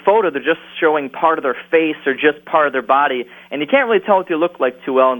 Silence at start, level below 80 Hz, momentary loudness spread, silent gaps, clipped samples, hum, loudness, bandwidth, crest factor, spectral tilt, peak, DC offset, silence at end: 0.05 s; -66 dBFS; 5 LU; none; under 0.1%; none; -16 LUFS; 18 kHz; 16 dB; -6.5 dB/octave; 0 dBFS; under 0.1%; 0 s